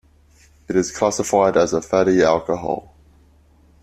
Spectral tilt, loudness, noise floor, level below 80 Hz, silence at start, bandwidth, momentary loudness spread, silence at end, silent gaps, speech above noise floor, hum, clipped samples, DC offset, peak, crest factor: -5 dB/octave; -19 LUFS; -53 dBFS; -50 dBFS; 0.7 s; 14.5 kHz; 8 LU; 1 s; none; 35 dB; none; under 0.1%; under 0.1%; -2 dBFS; 18 dB